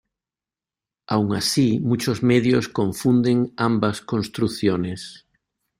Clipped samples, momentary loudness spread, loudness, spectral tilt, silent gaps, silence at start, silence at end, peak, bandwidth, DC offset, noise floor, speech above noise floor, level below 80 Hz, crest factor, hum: under 0.1%; 8 LU; -21 LUFS; -6 dB/octave; none; 1.1 s; 0.65 s; -6 dBFS; 15.5 kHz; under 0.1%; under -90 dBFS; over 70 dB; -56 dBFS; 16 dB; none